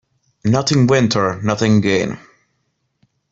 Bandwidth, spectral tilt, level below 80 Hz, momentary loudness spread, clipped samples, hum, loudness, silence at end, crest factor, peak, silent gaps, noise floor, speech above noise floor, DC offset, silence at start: 7.8 kHz; -5.5 dB/octave; -50 dBFS; 10 LU; under 0.1%; none; -16 LUFS; 1.15 s; 16 dB; -2 dBFS; none; -69 dBFS; 54 dB; under 0.1%; 0.45 s